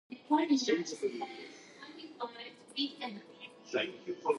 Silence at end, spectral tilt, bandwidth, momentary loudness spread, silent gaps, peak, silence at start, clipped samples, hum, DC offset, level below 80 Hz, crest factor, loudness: 0 s; -3 dB/octave; 11.5 kHz; 20 LU; none; -16 dBFS; 0.1 s; under 0.1%; none; under 0.1%; -90 dBFS; 20 dB; -35 LUFS